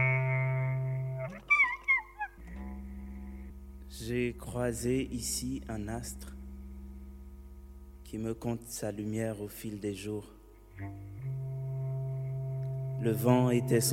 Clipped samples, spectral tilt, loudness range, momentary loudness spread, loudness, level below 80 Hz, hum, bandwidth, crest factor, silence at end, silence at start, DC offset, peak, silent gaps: under 0.1%; -5.5 dB/octave; 9 LU; 21 LU; -33 LUFS; -50 dBFS; none; 16 kHz; 20 dB; 0 s; 0 s; under 0.1%; -14 dBFS; none